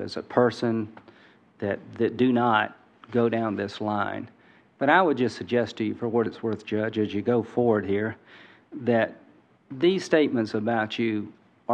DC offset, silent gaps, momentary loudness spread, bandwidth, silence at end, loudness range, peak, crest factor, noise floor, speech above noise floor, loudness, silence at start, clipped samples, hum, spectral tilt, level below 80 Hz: under 0.1%; none; 11 LU; 9.2 kHz; 0 s; 2 LU; -6 dBFS; 20 dB; -56 dBFS; 31 dB; -25 LUFS; 0 s; under 0.1%; none; -6.5 dB/octave; -72 dBFS